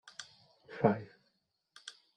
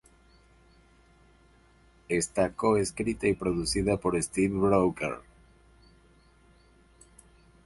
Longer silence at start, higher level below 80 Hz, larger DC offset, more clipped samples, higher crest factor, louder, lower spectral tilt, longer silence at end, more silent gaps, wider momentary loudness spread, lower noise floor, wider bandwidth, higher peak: second, 0.05 s vs 2.1 s; second, -74 dBFS vs -50 dBFS; neither; neither; first, 28 dB vs 20 dB; second, -33 LUFS vs -28 LUFS; first, -6.5 dB/octave vs -5 dB/octave; second, 0.25 s vs 2.45 s; neither; first, 23 LU vs 7 LU; first, -80 dBFS vs -60 dBFS; second, 10.5 kHz vs 12 kHz; about the same, -12 dBFS vs -10 dBFS